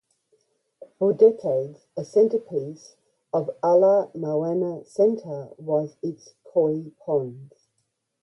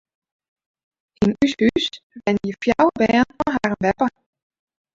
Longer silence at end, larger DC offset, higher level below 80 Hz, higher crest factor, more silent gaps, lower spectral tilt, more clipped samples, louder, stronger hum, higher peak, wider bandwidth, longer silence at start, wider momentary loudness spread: about the same, 0.75 s vs 0.85 s; neither; second, -74 dBFS vs -48 dBFS; about the same, 18 dB vs 18 dB; second, none vs 2.03-2.10 s; first, -8.5 dB/octave vs -6 dB/octave; neither; second, -23 LUFS vs -20 LUFS; neither; second, -6 dBFS vs -2 dBFS; about the same, 8.4 kHz vs 7.8 kHz; second, 1 s vs 1.2 s; first, 16 LU vs 6 LU